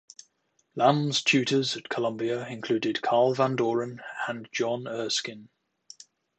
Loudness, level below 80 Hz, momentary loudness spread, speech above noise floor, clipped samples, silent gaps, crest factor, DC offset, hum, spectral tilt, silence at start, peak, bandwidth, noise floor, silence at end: -27 LUFS; -76 dBFS; 10 LU; 45 dB; under 0.1%; none; 22 dB; under 0.1%; none; -4.5 dB/octave; 0.75 s; -6 dBFS; 9.2 kHz; -72 dBFS; 0.9 s